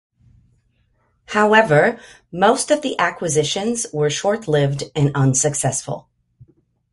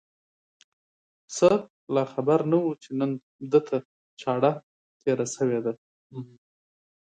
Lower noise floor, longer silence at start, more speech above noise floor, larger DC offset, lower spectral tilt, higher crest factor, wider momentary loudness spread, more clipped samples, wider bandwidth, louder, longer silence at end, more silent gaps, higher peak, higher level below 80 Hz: second, -63 dBFS vs under -90 dBFS; about the same, 1.3 s vs 1.3 s; second, 45 dB vs over 65 dB; neither; second, -4 dB/octave vs -6 dB/octave; about the same, 18 dB vs 22 dB; second, 10 LU vs 19 LU; neither; first, 11.5 kHz vs 9.4 kHz; first, -18 LUFS vs -26 LUFS; about the same, 0.9 s vs 0.85 s; second, none vs 1.70-1.87 s, 3.23-3.39 s, 3.85-4.17 s, 4.63-5.00 s, 5.78-6.10 s; first, 0 dBFS vs -6 dBFS; first, -54 dBFS vs -70 dBFS